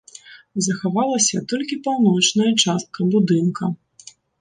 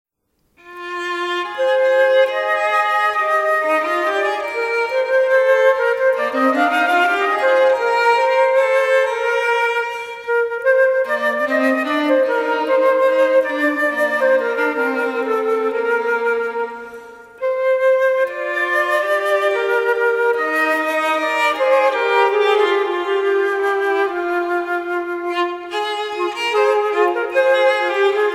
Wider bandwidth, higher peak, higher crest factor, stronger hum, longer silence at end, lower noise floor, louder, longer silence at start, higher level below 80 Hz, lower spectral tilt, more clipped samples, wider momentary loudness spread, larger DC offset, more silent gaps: second, 10.5 kHz vs 15 kHz; about the same, -4 dBFS vs -4 dBFS; about the same, 16 dB vs 14 dB; neither; first, 0.65 s vs 0 s; second, -47 dBFS vs -66 dBFS; about the same, -19 LUFS vs -17 LUFS; second, 0.3 s vs 0.65 s; about the same, -66 dBFS vs -66 dBFS; first, -4 dB/octave vs -2 dB/octave; neither; first, 10 LU vs 7 LU; neither; neither